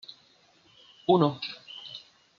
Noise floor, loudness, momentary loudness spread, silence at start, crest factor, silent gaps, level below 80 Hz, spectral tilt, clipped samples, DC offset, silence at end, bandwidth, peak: -62 dBFS; -27 LUFS; 21 LU; 1.1 s; 22 dB; none; -76 dBFS; -5.5 dB/octave; under 0.1%; under 0.1%; 0.4 s; 7 kHz; -8 dBFS